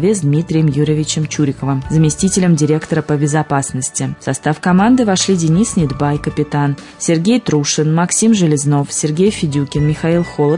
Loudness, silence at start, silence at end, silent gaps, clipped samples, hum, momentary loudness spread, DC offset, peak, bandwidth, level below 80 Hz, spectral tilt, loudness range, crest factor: -14 LUFS; 0 s; 0 s; none; under 0.1%; none; 6 LU; under 0.1%; -2 dBFS; 11 kHz; -40 dBFS; -5.5 dB/octave; 1 LU; 12 dB